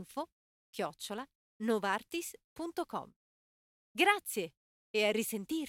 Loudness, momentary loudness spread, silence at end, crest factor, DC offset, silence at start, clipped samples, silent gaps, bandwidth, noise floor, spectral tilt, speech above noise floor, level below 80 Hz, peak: -35 LUFS; 16 LU; 0 s; 24 dB; under 0.1%; 0 s; under 0.1%; 0.32-0.73 s, 1.35-1.60 s, 2.44-2.56 s, 3.16-3.95 s, 4.57-4.94 s; 16.5 kHz; under -90 dBFS; -3 dB/octave; over 55 dB; -78 dBFS; -12 dBFS